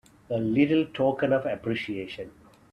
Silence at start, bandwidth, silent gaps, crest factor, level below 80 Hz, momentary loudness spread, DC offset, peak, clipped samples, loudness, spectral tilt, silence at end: 0.3 s; 9.2 kHz; none; 18 dB; -60 dBFS; 15 LU; under 0.1%; -8 dBFS; under 0.1%; -26 LUFS; -8 dB/octave; 0.45 s